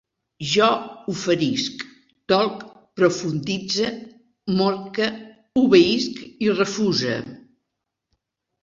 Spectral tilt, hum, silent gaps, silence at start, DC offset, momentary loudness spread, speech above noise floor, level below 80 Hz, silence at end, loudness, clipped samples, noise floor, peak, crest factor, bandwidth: -5 dB/octave; none; none; 0.4 s; under 0.1%; 18 LU; 60 dB; -60 dBFS; 1.25 s; -21 LUFS; under 0.1%; -80 dBFS; -2 dBFS; 20 dB; 7.8 kHz